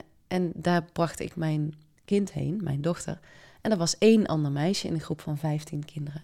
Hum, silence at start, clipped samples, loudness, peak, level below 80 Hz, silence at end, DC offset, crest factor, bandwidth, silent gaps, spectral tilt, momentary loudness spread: none; 0.3 s; under 0.1%; -28 LUFS; -8 dBFS; -58 dBFS; 0 s; under 0.1%; 18 dB; 14.5 kHz; none; -6 dB/octave; 13 LU